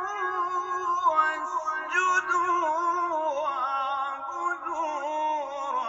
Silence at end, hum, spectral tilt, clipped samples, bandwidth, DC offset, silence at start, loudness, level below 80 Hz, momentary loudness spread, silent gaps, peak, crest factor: 0 s; none; -2 dB/octave; under 0.1%; 8 kHz; under 0.1%; 0 s; -27 LUFS; -70 dBFS; 7 LU; none; -10 dBFS; 16 dB